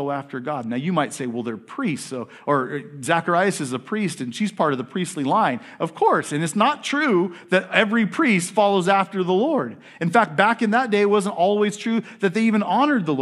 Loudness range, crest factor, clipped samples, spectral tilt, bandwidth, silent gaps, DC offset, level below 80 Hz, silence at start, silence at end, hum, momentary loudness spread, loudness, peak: 5 LU; 20 dB; under 0.1%; -5 dB/octave; 12.5 kHz; none; under 0.1%; -76 dBFS; 0 s; 0 s; none; 9 LU; -21 LUFS; 0 dBFS